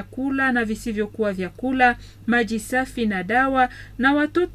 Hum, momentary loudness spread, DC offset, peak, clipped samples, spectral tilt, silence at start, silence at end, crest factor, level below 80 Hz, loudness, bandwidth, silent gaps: none; 7 LU; under 0.1%; -4 dBFS; under 0.1%; -5 dB/octave; 0 s; 0 s; 18 dB; -44 dBFS; -22 LUFS; 15 kHz; none